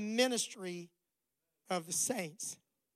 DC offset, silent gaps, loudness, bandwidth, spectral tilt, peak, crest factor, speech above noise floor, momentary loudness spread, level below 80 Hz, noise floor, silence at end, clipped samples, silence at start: under 0.1%; none; -36 LUFS; 16 kHz; -2.5 dB/octave; -18 dBFS; 22 dB; 51 dB; 13 LU; -88 dBFS; -88 dBFS; 0.4 s; under 0.1%; 0 s